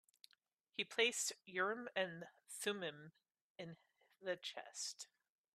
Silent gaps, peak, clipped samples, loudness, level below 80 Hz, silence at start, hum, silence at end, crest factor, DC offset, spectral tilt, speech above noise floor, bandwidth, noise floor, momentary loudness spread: 3.41-3.55 s; -20 dBFS; under 0.1%; -43 LUFS; under -90 dBFS; 0.8 s; none; 0.5 s; 26 dB; under 0.1%; -1.5 dB/octave; 35 dB; 14 kHz; -79 dBFS; 19 LU